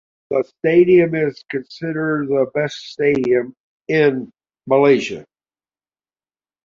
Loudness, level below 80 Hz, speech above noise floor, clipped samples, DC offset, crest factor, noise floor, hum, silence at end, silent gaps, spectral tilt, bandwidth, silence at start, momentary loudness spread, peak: -18 LUFS; -58 dBFS; over 73 dB; under 0.1%; under 0.1%; 16 dB; under -90 dBFS; none; 1.45 s; 3.60-3.80 s; -7 dB/octave; 7.4 kHz; 0.3 s; 14 LU; -2 dBFS